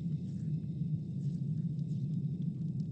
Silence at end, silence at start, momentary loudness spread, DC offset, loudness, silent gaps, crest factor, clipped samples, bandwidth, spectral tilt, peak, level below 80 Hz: 0 s; 0 s; 2 LU; under 0.1%; -37 LUFS; none; 10 dB; under 0.1%; 5.6 kHz; -10.5 dB/octave; -24 dBFS; -62 dBFS